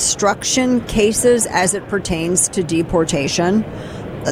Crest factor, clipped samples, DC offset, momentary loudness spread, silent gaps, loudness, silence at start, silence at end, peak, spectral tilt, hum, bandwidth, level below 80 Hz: 16 dB; under 0.1%; under 0.1%; 7 LU; none; -16 LUFS; 0 s; 0 s; 0 dBFS; -3.5 dB/octave; none; 16.5 kHz; -38 dBFS